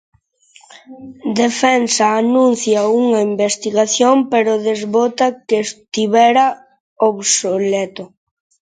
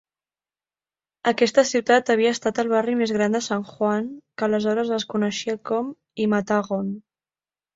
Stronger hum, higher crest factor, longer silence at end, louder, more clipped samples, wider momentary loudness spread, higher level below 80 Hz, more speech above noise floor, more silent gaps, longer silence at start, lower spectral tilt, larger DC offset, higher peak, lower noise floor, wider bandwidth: second, none vs 50 Hz at -55 dBFS; about the same, 16 dB vs 20 dB; second, 0.55 s vs 0.75 s; first, -15 LUFS vs -22 LUFS; neither; about the same, 8 LU vs 9 LU; about the same, -66 dBFS vs -66 dBFS; second, 36 dB vs over 68 dB; first, 6.80-6.96 s vs none; second, 0.9 s vs 1.25 s; second, -3 dB/octave vs -4.5 dB/octave; neither; first, 0 dBFS vs -4 dBFS; second, -50 dBFS vs under -90 dBFS; first, 9.6 kHz vs 7.8 kHz